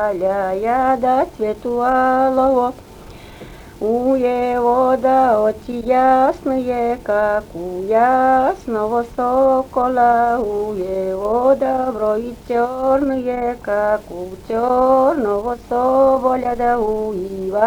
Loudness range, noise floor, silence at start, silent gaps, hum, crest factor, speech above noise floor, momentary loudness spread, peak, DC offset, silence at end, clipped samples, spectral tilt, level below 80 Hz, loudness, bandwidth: 2 LU; -37 dBFS; 0 s; none; none; 16 dB; 21 dB; 9 LU; -2 dBFS; under 0.1%; 0 s; under 0.1%; -6.5 dB/octave; -42 dBFS; -17 LUFS; 19.5 kHz